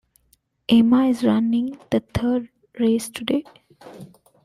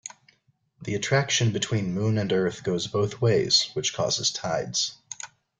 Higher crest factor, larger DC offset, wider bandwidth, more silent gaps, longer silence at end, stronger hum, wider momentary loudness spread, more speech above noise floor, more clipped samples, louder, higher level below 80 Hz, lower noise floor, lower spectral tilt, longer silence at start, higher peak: about the same, 16 dB vs 18 dB; neither; first, 14 kHz vs 9.6 kHz; neither; about the same, 0.4 s vs 0.35 s; neither; second, 10 LU vs 13 LU; about the same, 44 dB vs 42 dB; neither; first, -21 LUFS vs -25 LUFS; first, -50 dBFS vs -60 dBFS; about the same, -64 dBFS vs -67 dBFS; first, -6 dB/octave vs -4 dB/octave; first, 0.7 s vs 0.05 s; about the same, -6 dBFS vs -8 dBFS